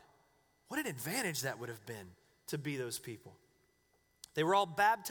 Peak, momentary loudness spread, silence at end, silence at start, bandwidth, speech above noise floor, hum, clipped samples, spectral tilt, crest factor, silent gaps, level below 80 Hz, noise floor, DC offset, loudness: -18 dBFS; 18 LU; 0 s; 0.7 s; over 20 kHz; 38 dB; none; under 0.1%; -3.5 dB/octave; 22 dB; none; -76 dBFS; -75 dBFS; under 0.1%; -36 LUFS